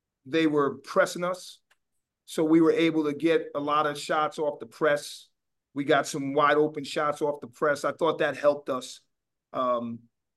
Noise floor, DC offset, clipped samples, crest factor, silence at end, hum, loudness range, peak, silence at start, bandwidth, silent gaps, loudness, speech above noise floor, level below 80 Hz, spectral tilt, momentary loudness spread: -81 dBFS; under 0.1%; under 0.1%; 18 dB; 0.4 s; none; 3 LU; -10 dBFS; 0.25 s; 12.5 kHz; none; -26 LUFS; 55 dB; -80 dBFS; -5 dB/octave; 14 LU